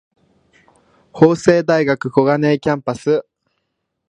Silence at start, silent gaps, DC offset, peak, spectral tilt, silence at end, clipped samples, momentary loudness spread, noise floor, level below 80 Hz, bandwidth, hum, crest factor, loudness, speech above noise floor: 1.15 s; none; under 0.1%; 0 dBFS; -7 dB/octave; 0.9 s; under 0.1%; 7 LU; -73 dBFS; -56 dBFS; 10 kHz; none; 18 dB; -16 LUFS; 58 dB